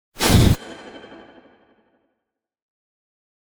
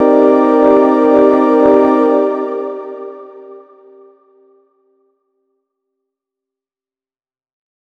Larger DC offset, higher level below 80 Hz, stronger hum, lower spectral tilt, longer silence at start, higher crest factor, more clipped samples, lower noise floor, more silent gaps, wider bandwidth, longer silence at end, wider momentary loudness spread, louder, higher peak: neither; first, -32 dBFS vs -54 dBFS; neither; second, -5 dB/octave vs -7.5 dB/octave; first, 0.2 s vs 0 s; first, 20 dB vs 14 dB; neither; second, -81 dBFS vs under -90 dBFS; neither; first, over 20 kHz vs 6.2 kHz; second, 2.55 s vs 4.4 s; first, 25 LU vs 18 LU; second, -17 LUFS vs -10 LUFS; about the same, -2 dBFS vs 0 dBFS